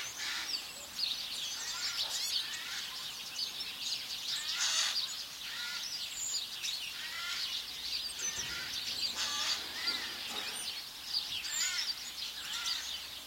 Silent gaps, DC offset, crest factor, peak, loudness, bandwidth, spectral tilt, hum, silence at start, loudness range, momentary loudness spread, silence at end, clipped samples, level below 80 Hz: none; under 0.1%; 20 dB; -18 dBFS; -35 LUFS; 16.5 kHz; 1.5 dB/octave; none; 0 s; 2 LU; 6 LU; 0 s; under 0.1%; -70 dBFS